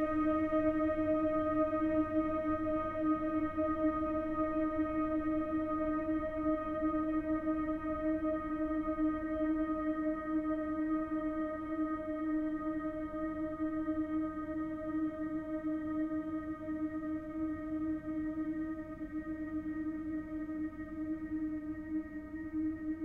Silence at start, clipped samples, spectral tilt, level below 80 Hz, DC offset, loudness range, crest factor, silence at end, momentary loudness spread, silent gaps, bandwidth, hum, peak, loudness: 0 s; under 0.1%; -9 dB/octave; -54 dBFS; under 0.1%; 6 LU; 14 dB; 0 s; 8 LU; none; 3.4 kHz; none; -22 dBFS; -36 LUFS